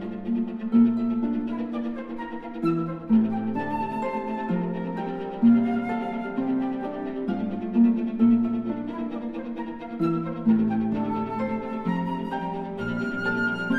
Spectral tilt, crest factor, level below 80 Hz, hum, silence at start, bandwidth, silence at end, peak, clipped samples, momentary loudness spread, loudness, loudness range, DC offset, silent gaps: -9 dB/octave; 16 dB; -56 dBFS; none; 0 s; 4.7 kHz; 0 s; -10 dBFS; under 0.1%; 11 LU; -26 LUFS; 3 LU; under 0.1%; none